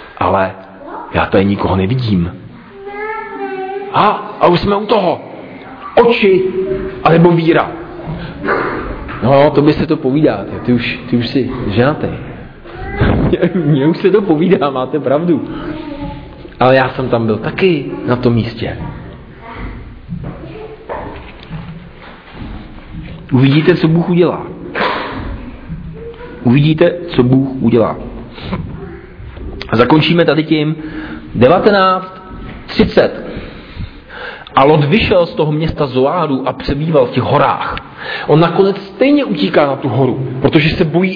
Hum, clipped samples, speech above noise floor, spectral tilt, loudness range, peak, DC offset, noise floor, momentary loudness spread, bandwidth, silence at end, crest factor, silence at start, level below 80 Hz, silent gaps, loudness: none; under 0.1%; 22 dB; -9.5 dB/octave; 5 LU; 0 dBFS; under 0.1%; -34 dBFS; 20 LU; 5.4 kHz; 0 s; 14 dB; 0 s; -34 dBFS; none; -13 LUFS